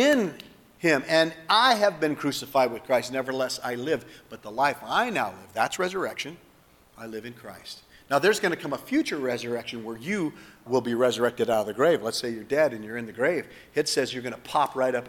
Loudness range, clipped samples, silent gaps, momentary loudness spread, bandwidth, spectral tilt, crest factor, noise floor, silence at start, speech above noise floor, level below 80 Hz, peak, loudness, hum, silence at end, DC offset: 5 LU; under 0.1%; none; 15 LU; 19 kHz; -4 dB/octave; 20 dB; -57 dBFS; 0 s; 31 dB; -66 dBFS; -6 dBFS; -26 LUFS; none; 0 s; under 0.1%